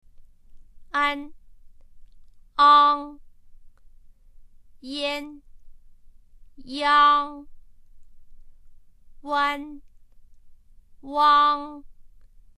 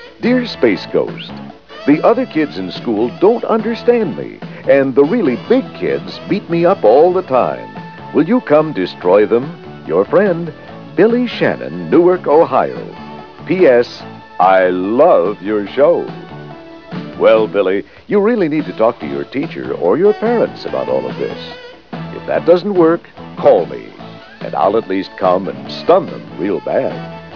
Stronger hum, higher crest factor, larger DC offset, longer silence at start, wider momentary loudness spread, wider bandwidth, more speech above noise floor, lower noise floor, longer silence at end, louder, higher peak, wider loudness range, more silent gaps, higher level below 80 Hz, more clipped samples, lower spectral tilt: neither; first, 20 dB vs 14 dB; second, under 0.1% vs 0.4%; first, 0.2 s vs 0 s; first, 26 LU vs 18 LU; first, 12 kHz vs 5.4 kHz; first, 27 dB vs 19 dB; first, -48 dBFS vs -33 dBFS; first, 0.5 s vs 0 s; second, -21 LUFS vs -14 LUFS; second, -6 dBFS vs 0 dBFS; first, 11 LU vs 3 LU; neither; about the same, -52 dBFS vs -54 dBFS; neither; second, -2.5 dB/octave vs -8 dB/octave